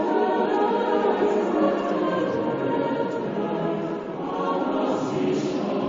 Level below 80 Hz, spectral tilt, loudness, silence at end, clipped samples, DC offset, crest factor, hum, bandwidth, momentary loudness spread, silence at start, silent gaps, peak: -62 dBFS; -7 dB/octave; -24 LUFS; 0 s; under 0.1%; under 0.1%; 14 dB; none; 7.6 kHz; 5 LU; 0 s; none; -10 dBFS